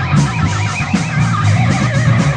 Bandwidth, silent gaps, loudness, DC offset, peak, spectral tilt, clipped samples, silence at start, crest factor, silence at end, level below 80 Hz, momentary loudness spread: 10 kHz; none; -14 LUFS; under 0.1%; -2 dBFS; -6 dB/octave; under 0.1%; 0 s; 10 dB; 0 s; -34 dBFS; 3 LU